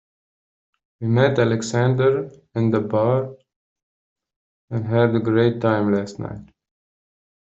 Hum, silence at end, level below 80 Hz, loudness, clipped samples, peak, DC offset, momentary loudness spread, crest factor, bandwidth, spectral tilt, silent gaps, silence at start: none; 1 s; -58 dBFS; -20 LUFS; under 0.1%; -4 dBFS; under 0.1%; 12 LU; 18 dB; 7.8 kHz; -7 dB/octave; 3.56-3.76 s, 3.83-4.16 s, 4.36-4.68 s; 1 s